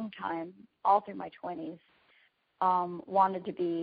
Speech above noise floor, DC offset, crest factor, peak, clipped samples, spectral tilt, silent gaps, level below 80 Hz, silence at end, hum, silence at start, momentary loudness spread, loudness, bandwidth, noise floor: 37 dB; under 0.1%; 20 dB; -12 dBFS; under 0.1%; -5 dB/octave; none; -78 dBFS; 0 s; none; 0 s; 14 LU; -31 LUFS; 4.9 kHz; -68 dBFS